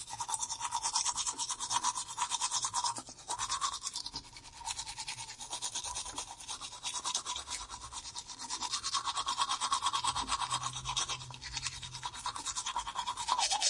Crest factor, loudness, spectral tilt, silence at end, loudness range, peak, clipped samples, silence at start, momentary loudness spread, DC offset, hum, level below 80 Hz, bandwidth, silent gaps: 22 dB; -35 LUFS; 0.5 dB/octave; 0 s; 5 LU; -14 dBFS; under 0.1%; 0 s; 10 LU; under 0.1%; none; -60 dBFS; 11.5 kHz; none